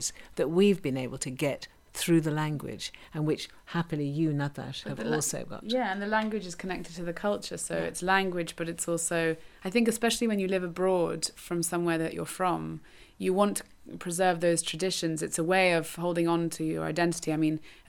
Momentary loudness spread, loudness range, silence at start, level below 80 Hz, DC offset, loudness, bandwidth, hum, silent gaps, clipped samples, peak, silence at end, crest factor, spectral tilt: 10 LU; 4 LU; 0 s; -58 dBFS; under 0.1%; -29 LUFS; 19 kHz; none; none; under 0.1%; -10 dBFS; 0.15 s; 18 dB; -4.5 dB/octave